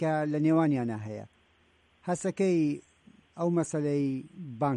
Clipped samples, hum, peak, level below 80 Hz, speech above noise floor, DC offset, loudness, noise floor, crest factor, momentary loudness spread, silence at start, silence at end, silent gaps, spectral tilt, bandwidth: under 0.1%; none; -16 dBFS; -70 dBFS; 37 dB; under 0.1%; -29 LUFS; -66 dBFS; 14 dB; 15 LU; 0 s; 0 s; none; -7.5 dB/octave; 11 kHz